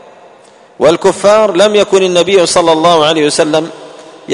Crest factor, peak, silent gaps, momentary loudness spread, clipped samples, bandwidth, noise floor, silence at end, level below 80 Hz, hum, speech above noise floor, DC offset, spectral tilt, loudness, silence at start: 10 dB; 0 dBFS; none; 4 LU; 0.2%; 11 kHz; -40 dBFS; 0 s; -50 dBFS; none; 31 dB; under 0.1%; -3.5 dB/octave; -9 LUFS; 0.8 s